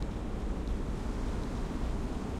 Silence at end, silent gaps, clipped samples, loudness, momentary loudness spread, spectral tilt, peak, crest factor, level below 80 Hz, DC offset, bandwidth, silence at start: 0 s; none; under 0.1%; -37 LUFS; 1 LU; -7 dB/octave; -22 dBFS; 12 dB; -36 dBFS; under 0.1%; 12 kHz; 0 s